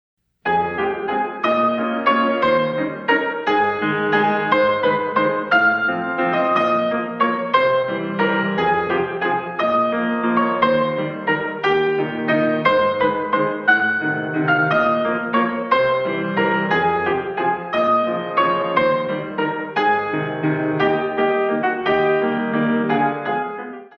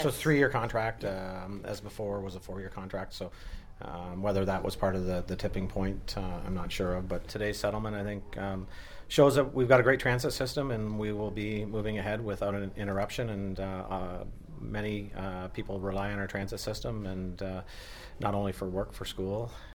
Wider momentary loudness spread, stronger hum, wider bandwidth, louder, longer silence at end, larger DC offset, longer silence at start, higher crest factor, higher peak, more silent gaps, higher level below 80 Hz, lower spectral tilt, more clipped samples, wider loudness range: second, 5 LU vs 15 LU; neither; second, 6.6 kHz vs 19 kHz; first, -19 LUFS vs -32 LUFS; about the same, 0.1 s vs 0.05 s; neither; first, 0.45 s vs 0 s; second, 16 dB vs 24 dB; first, -2 dBFS vs -8 dBFS; neither; second, -58 dBFS vs -44 dBFS; first, -7.5 dB/octave vs -6 dB/octave; neither; second, 2 LU vs 9 LU